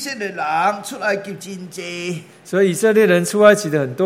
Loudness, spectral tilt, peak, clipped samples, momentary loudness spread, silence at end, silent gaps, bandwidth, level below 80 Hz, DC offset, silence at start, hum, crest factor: -17 LUFS; -5 dB/octave; 0 dBFS; under 0.1%; 17 LU; 0 s; none; 16.5 kHz; -68 dBFS; under 0.1%; 0 s; none; 18 dB